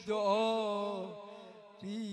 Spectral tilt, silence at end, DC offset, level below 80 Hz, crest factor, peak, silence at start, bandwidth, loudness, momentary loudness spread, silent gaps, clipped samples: -5 dB/octave; 0 s; under 0.1%; -82 dBFS; 16 dB; -20 dBFS; 0 s; 10.5 kHz; -34 LUFS; 20 LU; none; under 0.1%